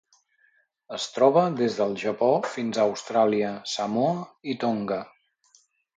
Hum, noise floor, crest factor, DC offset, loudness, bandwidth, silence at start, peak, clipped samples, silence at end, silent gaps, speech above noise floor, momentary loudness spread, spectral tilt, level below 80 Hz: none; -66 dBFS; 20 dB; under 0.1%; -25 LUFS; 9.4 kHz; 0.9 s; -6 dBFS; under 0.1%; 0.9 s; none; 41 dB; 12 LU; -5 dB/octave; -72 dBFS